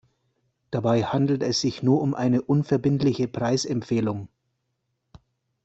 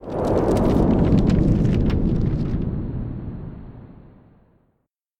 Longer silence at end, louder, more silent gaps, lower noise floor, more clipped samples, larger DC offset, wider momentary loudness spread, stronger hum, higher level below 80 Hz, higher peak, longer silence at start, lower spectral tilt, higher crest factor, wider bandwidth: first, 1.4 s vs 1.25 s; second, -24 LUFS vs -20 LUFS; neither; first, -77 dBFS vs -71 dBFS; neither; neither; second, 5 LU vs 17 LU; neither; second, -60 dBFS vs -28 dBFS; second, -8 dBFS vs -4 dBFS; first, 0.7 s vs 0 s; second, -6.5 dB/octave vs -9.5 dB/octave; about the same, 16 dB vs 16 dB; second, 8.2 kHz vs 11.5 kHz